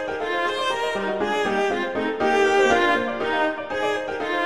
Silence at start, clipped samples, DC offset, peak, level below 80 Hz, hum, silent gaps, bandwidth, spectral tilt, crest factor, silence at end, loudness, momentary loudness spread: 0 s; under 0.1%; 0.4%; -6 dBFS; -54 dBFS; none; none; 12.5 kHz; -3.5 dB/octave; 16 dB; 0 s; -22 LUFS; 7 LU